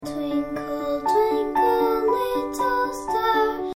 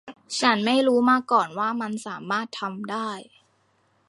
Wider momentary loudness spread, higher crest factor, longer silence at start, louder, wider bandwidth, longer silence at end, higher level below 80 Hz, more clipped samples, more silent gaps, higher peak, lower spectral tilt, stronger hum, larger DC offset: second, 6 LU vs 12 LU; second, 14 dB vs 20 dB; about the same, 0 s vs 0.05 s; about the same, -23 LUFS vs -24 LUFS; first, 17 kHz vs 11.5 kHz; second, 0 s vs 0.85 s; first, -50 dBFS vs -76 dBFS; neither; neither; second, -8 dBFS vs -4 dBFS; about the same, -4.5 dB/octave vs -4 dB/octave; neither; neither